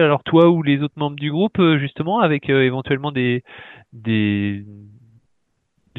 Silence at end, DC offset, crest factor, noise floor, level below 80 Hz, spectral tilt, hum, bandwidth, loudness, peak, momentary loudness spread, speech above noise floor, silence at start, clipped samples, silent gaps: 1.1 s; under 0.1%; 18 dB; -69 dBFS; -58 dBFS; -9.5 dB/octave; none; 4.1 kHz; -18 LUFS; -2 dBFS; 11 LU; 51 dB; 0 s; under 0.1%; none